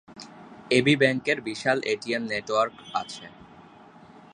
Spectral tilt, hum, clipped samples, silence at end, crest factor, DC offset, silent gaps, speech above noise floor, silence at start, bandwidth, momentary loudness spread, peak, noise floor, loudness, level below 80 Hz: -5 dB/octave; none; under 0.1%; 0.15 s; 22 dB; under 0.1%; none; 25 dB; 0.1 s; 11.5 kHz; 23 LU; -4 dBFS; -50 dBFS; -25 LUFS; -66 dBFS